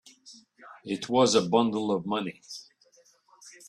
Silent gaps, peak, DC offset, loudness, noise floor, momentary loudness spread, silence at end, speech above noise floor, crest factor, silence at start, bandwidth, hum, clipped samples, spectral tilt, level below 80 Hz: none; -8 dBFS; under 0.1%; -26 LUFS; -62 dBFS; 21 LU; 0.2 s; 36 dB; 20 dB; 0.25 s; 12.5 kHz; none; under 0.1%; -4.5 dB/octave; -70 dBFS